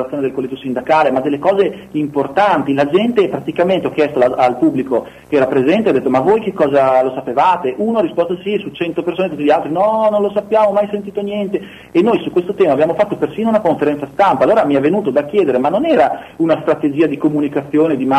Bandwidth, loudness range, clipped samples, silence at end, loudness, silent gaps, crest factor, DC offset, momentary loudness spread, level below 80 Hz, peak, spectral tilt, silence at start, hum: 13 kHz; 2 LU; under 0.1%; 0 s; -15 LUFS; none; 12 dB; under 0.1%; 7 LU; -52 dBFS; -2 dBFS; -7.5 dB/octave; 0 s; none